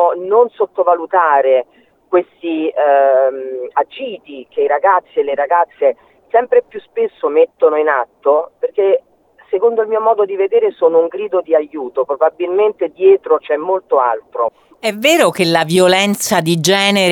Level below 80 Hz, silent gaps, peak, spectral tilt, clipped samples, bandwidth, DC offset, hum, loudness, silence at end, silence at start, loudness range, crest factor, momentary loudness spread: -66 dBFS; none; 0 dBFS; -4 dB/octave; under 0.1%; 19 kHz; under 0.1%; none; -14 LUFS; 0 s; 0 s; 2 LU; 14 dB; 9 LU